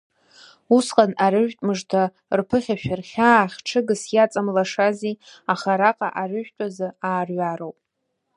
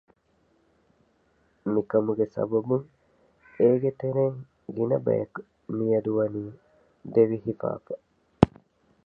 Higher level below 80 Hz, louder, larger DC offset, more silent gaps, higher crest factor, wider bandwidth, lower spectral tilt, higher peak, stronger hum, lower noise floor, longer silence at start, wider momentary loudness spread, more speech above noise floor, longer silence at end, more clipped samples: second, -60 dBFS vs -54 dBFS; first, -21 LUFS vs -26 LUFS; neither; neither; second, 20 dB vs 28 dB; first, 11 kHz vs 6 kHz; second, -5 dB/octave vs -10 dB/octave; about the same, 0 dBFS vs 0 dBFS; neither; first, -76 dBFS vs -67 dBFS; second, 0.7 s vs 1.65 s; second, 11 LU vs 15 LU; first, 55 dB vs 42 dB; about the same, 0.65 s vs 0.6 s; neither